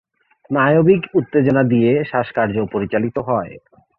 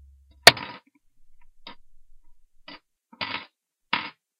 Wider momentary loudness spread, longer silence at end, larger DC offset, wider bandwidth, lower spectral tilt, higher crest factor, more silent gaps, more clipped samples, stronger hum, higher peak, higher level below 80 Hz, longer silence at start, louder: second, 8 LU vs 20 LU; about the same, 0.4 s vs 0.3 s; neither; second, 4.6 kHz vs 15.5 kHz; first, -10.5 dB/octave vs -1 dB/octave; second, 16 dB vs 28 dB; neither; neither; neither; about the same, -2 dBFS vs 0 dBFS; about the same, -52 dBFS vs -56 dBFS; about the same, 0.5 s vs 0.45 s; first, -17 LUFS vs -20 LUFS